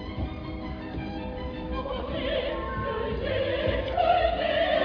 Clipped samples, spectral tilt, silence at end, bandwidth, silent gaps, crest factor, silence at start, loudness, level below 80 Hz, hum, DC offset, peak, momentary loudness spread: under 0.1%; -8 dB/octave; 0 s; 5.4 kHz; none; 16 dB; 0 s; -29 LUFS; -38 dBFS; none; under 0.1%; -12 dBFS; 11 LU